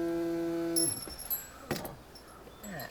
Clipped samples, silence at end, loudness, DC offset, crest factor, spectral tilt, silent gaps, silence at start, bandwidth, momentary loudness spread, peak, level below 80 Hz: under 0.1%; 0 s; -33 LUFS; under 0.1%; 18 dB; -3 dB/octave; none; 0 s; over 20 kHz; 21 LU; -16 dBFS; -58 dBFS